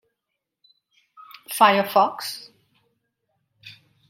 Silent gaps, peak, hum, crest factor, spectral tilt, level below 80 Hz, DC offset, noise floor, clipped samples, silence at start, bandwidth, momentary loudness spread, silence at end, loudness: none; -2 dBFS; none; 24 dB; -3 dB/octave; -80 dBFS; under 0.1%; -82 dBFS; under 0.1%; 1.5 s; 16.5 kHz; 20 LU; 0.4 s; -20 LUFS